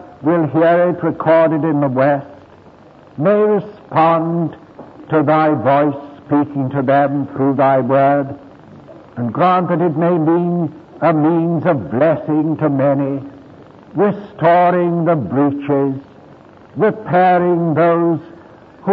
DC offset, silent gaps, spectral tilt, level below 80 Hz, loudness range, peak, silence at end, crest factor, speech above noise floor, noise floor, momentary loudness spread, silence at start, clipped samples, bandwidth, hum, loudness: under 0.1%; none; -11 dB/octave; -58 dBFS; 1 LU; -2 dBFS; 0 s; 12 dB; 28 dB; -42 dBFS; 9 LU; 0 s; under 0.1%; 5 kHz; none; -15 LUFS